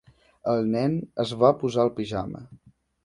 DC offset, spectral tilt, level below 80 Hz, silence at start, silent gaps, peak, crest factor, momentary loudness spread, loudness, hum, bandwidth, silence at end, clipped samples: under 0.1%; -7.5 dB/octave; -56 dBFS; 0.45 s; none; -4 dBFS; 22 dB; 12 LU; -25 LUFS; none; 11.5 kHz; 0.5 s; under 0.1%